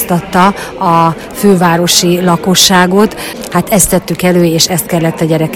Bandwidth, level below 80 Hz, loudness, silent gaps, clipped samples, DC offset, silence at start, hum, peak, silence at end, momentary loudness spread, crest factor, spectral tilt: 20 kHz; -36 dBFS; -9 LUFS; none; 1%; under 0.1%; 0 s; none; 0 dBFS; 0 s; 7 LU; 10 dB; -4 dB/octave